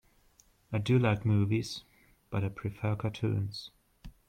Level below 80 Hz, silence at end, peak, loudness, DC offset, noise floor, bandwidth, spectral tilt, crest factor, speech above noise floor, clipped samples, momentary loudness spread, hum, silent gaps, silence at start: -58 dBFS; 0.2 s; -14 dBFS; -32 LUFS; under 0.1%; -65 dBFS; 9.6 kHz; -7 dB/octave; 18 dB; 35 dB; under 0.1%; 13 LU; none; none; 0.7 s